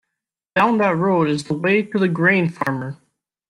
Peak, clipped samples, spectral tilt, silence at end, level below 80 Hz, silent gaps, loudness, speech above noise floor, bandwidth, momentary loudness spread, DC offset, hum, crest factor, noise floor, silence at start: -4 dBFS; under 0.1%; -7 dB/octave; 0.55 s; -62 dBFS; none; -19 LUFS; 64 dB; 11.5 kHz; 8 LU; under 0.1%; none; 16 dB; -82 dBFS; 0.55 s